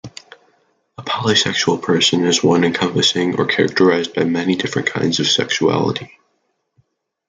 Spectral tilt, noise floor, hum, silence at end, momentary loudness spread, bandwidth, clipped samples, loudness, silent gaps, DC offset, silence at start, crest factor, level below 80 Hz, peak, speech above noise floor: -4 dB/octave; -68 dBFS; none; 1.2 s; 6 LU; 9.6 kHz; under 0.1%; -16 LUFS; none; under 0.1%; 0.05 s; 18 dB; -58 dBFS; 0 dBFS; 52 dB